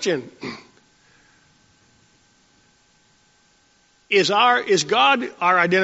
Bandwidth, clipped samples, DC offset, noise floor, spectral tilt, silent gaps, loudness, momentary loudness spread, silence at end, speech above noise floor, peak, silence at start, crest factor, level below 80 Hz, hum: 8 kHz; under 0.1%; under 0.1%; -60 dBFS; -1.5 dB/octave; none; -18 LUFS; 18 LU; 0 s; 41 dB; -4 dBFS; 0 s; 20 dB; -70 dBFS; none